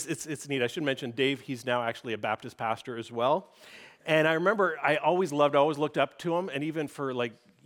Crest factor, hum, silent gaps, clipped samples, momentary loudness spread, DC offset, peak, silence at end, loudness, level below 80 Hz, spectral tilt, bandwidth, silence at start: 18 dB; none; none; under 0.1%; 9 LU; under 0.1%; -10 dBFS; 0.35 s; -29 LUFS; -78 dBFS; -5 dB/octave; 18 kHz; 0 s